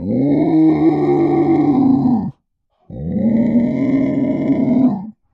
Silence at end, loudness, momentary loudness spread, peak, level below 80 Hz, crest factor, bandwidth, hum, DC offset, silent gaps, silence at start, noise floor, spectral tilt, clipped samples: 0.2 s; -15 LUFS; 9 LU; -4 dBFS; -46 dBFS; 12 dB; 5.4 kHz; none; under 0.1%; none; 0 s; -64 dBFS; -11 dB/octave; under 0.1%